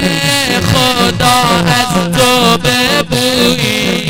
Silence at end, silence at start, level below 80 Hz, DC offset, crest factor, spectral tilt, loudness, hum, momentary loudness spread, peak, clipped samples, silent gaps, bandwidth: 0 s; 0 s; -32 dBFS; 1%; 10 dB; -3.5 dB/octave; -10 LUFS; none; 3 LU; 0 dBFS; 1%; none; over 20 kHz